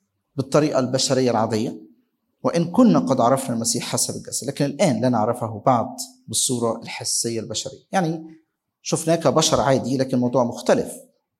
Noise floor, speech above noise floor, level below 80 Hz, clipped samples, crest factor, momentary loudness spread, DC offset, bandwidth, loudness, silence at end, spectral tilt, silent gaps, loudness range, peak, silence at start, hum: -66 dBFS; 45 dB; -58 dBFS; under 0.1%; 18 dB; 11 LU; under 0.1%; 16.5 kHz; -21 LUFS; 0.4 s; -4.5 dB/octave; none; 3 LU; -2 dBFS; 0.35 s; none